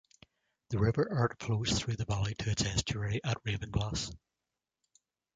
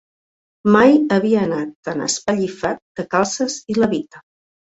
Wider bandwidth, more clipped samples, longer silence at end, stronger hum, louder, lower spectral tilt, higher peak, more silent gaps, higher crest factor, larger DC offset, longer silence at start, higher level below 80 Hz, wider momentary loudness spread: first, 9.4 kHz vs 8.2 kHz; neither; first, 1.2 s vs 0.5 s; neither; second, -33 LUFS vs -18 LUFS; about the same, -5 dB/octave vs -4.5 dB/octave; second, -14 dBFS vs -2 dBFS; second, none vs 1.75-1.83 s, 2.82-2.95 s; about the same, 20 dB vs 16 dB; neither; about the same, 0.7 s vs 0.65 s; first, -48 dBFS vs -56 dBFS; second, 5 LU vs 12 LU